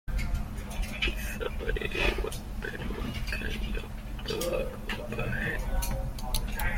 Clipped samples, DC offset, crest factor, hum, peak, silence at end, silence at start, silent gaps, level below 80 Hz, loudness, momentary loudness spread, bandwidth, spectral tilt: under 0.1%; under 0.1%; 18 dB; none; -12 dBFS; 0 s; 0.05 s; none; -34 dBFS; -33 LUFS; 7 LU; 16.5 kHz; -4.5 dB/octave